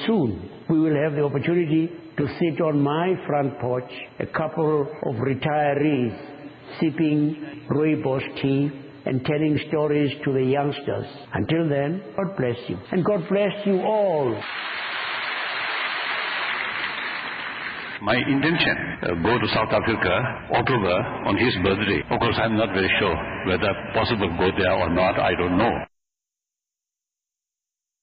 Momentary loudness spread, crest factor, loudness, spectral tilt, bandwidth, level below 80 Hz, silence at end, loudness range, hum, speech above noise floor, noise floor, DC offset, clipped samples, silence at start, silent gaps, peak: 8 LU; 16 dB; -23 LUFS; -4.5 dB/octave; 5.2 kHz; -50 dBFS; 2.15 s; 3 LU; none; 66 dB; -88 dBFS; under 0.1%; under 0.1%; 0 s; none; -8 dBFS